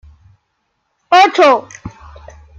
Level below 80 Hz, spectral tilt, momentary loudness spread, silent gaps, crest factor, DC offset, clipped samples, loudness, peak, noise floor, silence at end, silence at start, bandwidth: -46 dBFS; -3.5 dB/octave; 24 LU; none; 16 dB; under 0.1%; under 0.1%; -10 LUFS; 0 dBFS; -68 dBFS; 0.7 s; 1.1 s; 10 kHz